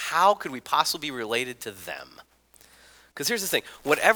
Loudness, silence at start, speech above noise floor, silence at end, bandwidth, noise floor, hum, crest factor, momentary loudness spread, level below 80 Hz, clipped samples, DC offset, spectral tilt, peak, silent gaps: -26 LUFS; 0 s; 31 dB; 0 s; over 20 kHz; -56 dBFS; none; 24 dB; 16 LU; -66 dBFS; under 0.1%; under 0.1%; -1.5 dB/octave; -2 dBFS; none